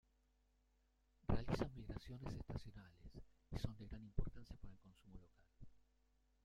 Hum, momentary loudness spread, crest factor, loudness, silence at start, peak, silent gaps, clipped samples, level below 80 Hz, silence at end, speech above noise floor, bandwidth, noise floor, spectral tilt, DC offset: none; 21 LU; 24 dB; -49 LUFS; 1.3 s; -24 dBFS; none; under 0.1%; -56 dBFS; 0.7 s; 31 dB; 12.5 kHz; -79 dBFS; -7.5 dB/octave; under 0.1%